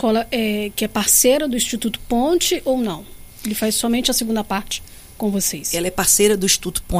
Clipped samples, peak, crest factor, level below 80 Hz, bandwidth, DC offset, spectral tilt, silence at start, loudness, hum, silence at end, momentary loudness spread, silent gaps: under 0.1%; -2 dBFS; 18 dB; -38 dBFS; 15.5 kHz; under 0.1%; -2.5 dB/octave; 0 s; -18 LUFS; none; 0 s; 12 LU; none